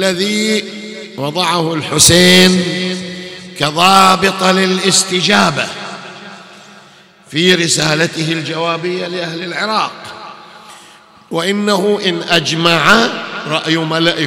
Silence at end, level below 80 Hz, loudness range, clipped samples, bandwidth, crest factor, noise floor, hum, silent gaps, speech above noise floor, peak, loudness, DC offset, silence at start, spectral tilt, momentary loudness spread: 0 s; -46 dBFS; 8 LU; 0.2%; over 20 kHz; 14 dB; -43 dBFS; none; none; 30 dB; 0 dBFS; -12 LUFS; under 0.1%; 0 s; -3 dB/octave; 19 LU